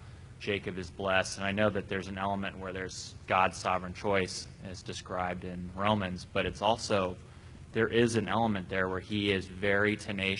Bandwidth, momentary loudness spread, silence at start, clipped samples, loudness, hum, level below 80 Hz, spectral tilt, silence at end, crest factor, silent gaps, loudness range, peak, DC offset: 11 kHz; 12 LU; 0 s; under 0.1%; -32 LUFS; none; -56 dBFS; -5 dB/octave; 0 s; 22 dB; none; 3 LU; -10 dBFS; under 0.1%